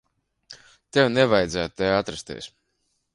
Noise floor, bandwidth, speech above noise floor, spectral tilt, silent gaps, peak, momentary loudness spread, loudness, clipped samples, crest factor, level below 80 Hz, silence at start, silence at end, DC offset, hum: -73 dBFS; 11.5 kHz; 51 dB; -5 dB/octave; none; -6 dBFS; 18 LU; -22 LUFS; under 0.1%; 20 dB; -52 dBFS; 0.5 s; 0.65 s; under 0.1%; none